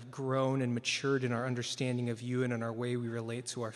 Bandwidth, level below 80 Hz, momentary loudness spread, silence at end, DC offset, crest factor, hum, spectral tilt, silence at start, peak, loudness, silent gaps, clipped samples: 12 kHz; -76 dBFS; 6 LU; 0 s; under 0.1%; 16 dB; none; -5 dB/octave; 0 s; -18 dBFS; -34 LUFS; none; under 0.1%